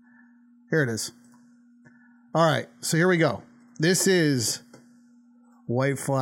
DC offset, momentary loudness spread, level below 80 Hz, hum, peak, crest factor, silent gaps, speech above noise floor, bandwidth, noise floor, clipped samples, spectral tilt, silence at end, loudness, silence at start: under 0.1%; 12 LU; -72 dBFS; none; -8 dBFS; 18 dB; none; 33 dB; 17 kHz; -56 dBFS; under 0.1%; -4.5 dB/octave; 0 s; -24 LUFS; 0.7 s